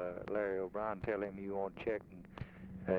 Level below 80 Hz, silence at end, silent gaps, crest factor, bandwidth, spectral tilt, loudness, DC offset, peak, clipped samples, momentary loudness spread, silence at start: -62 dBFS; 0 s; none; 20 dB; 6.4 kHz; -9 dB/octave; -41 LUFS; under 0.1%; -20 dBFS; under 0.1%; 12 LU; 0 s